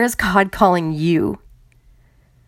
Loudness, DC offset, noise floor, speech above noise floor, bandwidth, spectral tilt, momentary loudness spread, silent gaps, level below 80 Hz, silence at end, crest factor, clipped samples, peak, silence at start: -17 LUFS; under 0.1%; -53 dBFS; 36 dB; 16.5 kHz; -5.5 dB/octave; 8 LU; none; -42 dBFS; 1.1 s; 20 dB; under 0.1%; 0 dBFS; 0 s